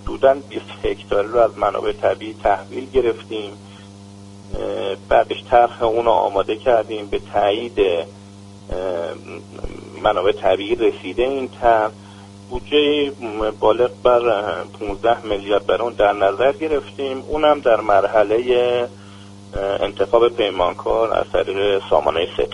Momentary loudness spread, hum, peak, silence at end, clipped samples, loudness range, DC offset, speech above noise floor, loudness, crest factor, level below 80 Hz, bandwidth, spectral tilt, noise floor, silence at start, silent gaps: 12 LU; none; 0 dBFS; 0 s; under 0.1%; 4 LU; under 0.1%; 21 dB; -19 LUFS; 18 dB; -40 dBFS; 11 kHz; -5.5 dB/octave; -39 dBFS; 0 s; none